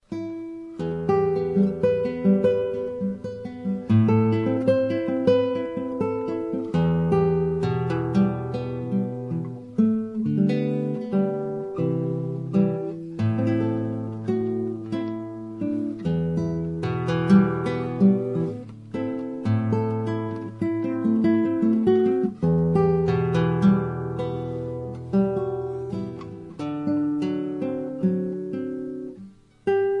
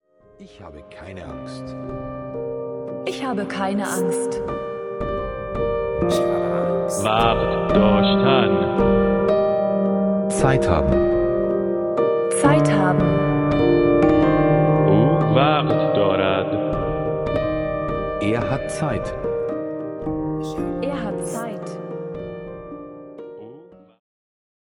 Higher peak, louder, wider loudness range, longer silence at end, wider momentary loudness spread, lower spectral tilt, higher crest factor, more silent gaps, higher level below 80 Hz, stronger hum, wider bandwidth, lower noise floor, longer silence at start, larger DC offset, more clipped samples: second, -6 dBFS vs -2 dBFS; second, -24 LUFS vs -20 LUFS; second, 5 LU vs 12 LU; second, 0 s vs 1.15 s; second, 11 LU vs 16 LU; first, -9.5 dB/octave vs -6.5 dB/octave; about the same, 18 dB vs 18 dB; neither; second, -56 dBFS vs -38 dBFS; neither; second, 7 kHz vs 17 kHz; about the same, -46 dBFS vs -45 dBFS; second, 0.1 s vs 0.4 s; neither; neither